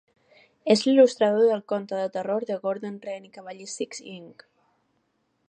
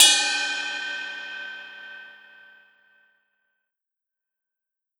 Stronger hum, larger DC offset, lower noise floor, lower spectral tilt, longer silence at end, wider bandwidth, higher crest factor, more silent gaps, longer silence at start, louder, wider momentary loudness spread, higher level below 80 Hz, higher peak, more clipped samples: neither; neither; second, -72 dBFS vs -87 dBFS; first, -4.5 dB/octave vs 3.5 dB/octave; second, 1.2 s vs 2.9 s; second, 10 kHz vs over 20 kHz; second, 20 dB vs 28 dB; neither; first, 0.65 s vs 0 s; about the same, -24 LUFS vs -23 LUFS; about the same, 20 LU vs 21 LU; about the same, -80 dBFS vs -80 dBFS; second, -6 dBFS vs 0 dBFS; neither